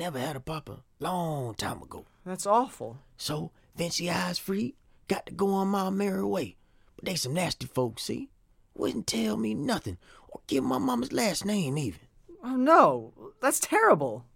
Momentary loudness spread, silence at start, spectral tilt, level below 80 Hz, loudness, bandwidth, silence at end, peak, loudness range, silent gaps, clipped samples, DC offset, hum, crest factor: 19 LU; 0 s; -4.5 dB/octave; -58 dBFS; -28 LUFS; 17 kHz; 0.15 s; -6 dBFS; 6 LU; none; under 0.1%; under 0.1%; none; 24 dB